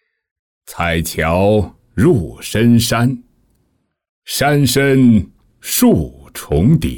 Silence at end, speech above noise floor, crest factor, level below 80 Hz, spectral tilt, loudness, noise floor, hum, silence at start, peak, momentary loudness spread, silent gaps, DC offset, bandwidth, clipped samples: 0 s; 51 dB; 14 dB; -36 dBFS; -5.5 dB/octave; -14 LUFS; -64 dBFS; none; 0.7 s; -2 dBFS; 15 LU; 4.09-4.22 s; under 0.1%; 19.5 kHz; under 0.1%